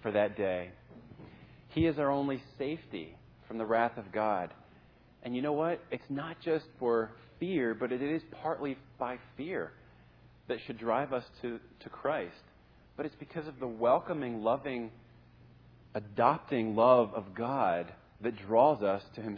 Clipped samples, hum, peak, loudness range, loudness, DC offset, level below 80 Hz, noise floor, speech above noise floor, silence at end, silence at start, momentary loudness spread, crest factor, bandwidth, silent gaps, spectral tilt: under 0.1%; none; -10 dBFS; 7 LU; -33 LUFS; under 0.1%; -64 dBFS; -61 dBFS; 28 dB; 0 s; 0 s; 16 LU; 22 dB; 5.4 kHz; none; -9 dB/octave